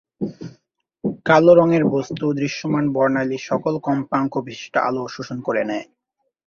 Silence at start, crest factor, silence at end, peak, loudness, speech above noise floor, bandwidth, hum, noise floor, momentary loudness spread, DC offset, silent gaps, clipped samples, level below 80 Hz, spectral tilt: 0.2 s; 18 dB; 0.65 s; -2 dBFS; -20 LUFS; 44 dB; 7 kHz; none; -63 dBFS; 16 LU; under 0.1%; none; under 0.1%; -60 dBFS; -7 dB/octave